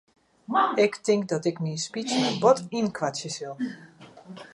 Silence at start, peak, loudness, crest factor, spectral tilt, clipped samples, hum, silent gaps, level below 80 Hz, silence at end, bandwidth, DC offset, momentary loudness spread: 0.5 s; -6 dBFS; -26 LUFS; 20 dB; -4.5 dB/octave; under 0.1%; none; none; -72 dBFS; 0.1 s; 11.5 kHz; under 0.1%; 13 LU